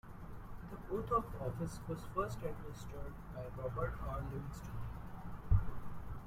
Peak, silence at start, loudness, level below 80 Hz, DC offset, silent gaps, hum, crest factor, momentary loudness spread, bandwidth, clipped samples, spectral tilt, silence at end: -18 dBFS; 0.05 s; -42 LUFS; -46 dBFS; under 0.1%; none; none; 22 dB; 14 LU; 16 kHz; under 0.1%; -7.5 dB/octave; 0 s